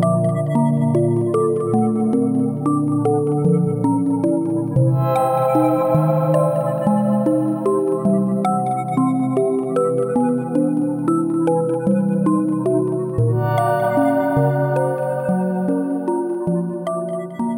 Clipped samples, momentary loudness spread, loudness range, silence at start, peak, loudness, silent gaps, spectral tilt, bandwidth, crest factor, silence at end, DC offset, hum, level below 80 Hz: under 0.1%; 4 LU; 2 LU; 0 s; -4 dBFS; -19 LUFS; none; -9 dB/octave; 17 kHz; 14 dB; 0 s; under 0.1%; none; -54 dBFS